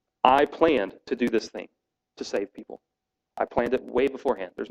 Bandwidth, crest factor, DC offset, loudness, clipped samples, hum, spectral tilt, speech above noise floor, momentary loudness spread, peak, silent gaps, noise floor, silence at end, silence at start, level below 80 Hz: 12.5 kHz; 24 dB; under 0.1%; -25 LUFS; under 0.1%; none; -5 dB/octave; 24 dB; 19 LU; -2 dBFS; none; -49 dBFS; 0.05 s; 0.25 s; -56 dBFS